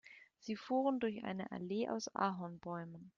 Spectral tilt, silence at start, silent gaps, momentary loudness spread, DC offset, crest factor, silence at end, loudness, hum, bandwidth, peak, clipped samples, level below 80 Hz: -5.5 dB/octave; 0.05 s; none; 10 LU; under 0.1%; 18 dB; 0.1 s; -40 LUFS; none; 7.4 kHz; -22 dBFS; under 0.1%; -80 dBFS